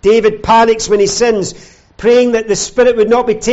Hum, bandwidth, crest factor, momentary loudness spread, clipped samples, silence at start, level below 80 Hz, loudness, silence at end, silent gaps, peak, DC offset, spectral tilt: none; 8.2 kHz; 10 dB; 6 LU; under 0.1%; 0.05 s; -38 dBFS; -11 LUFS; 0 s; none; -2 dBFS; under 0.1%; -3.5 dB/octave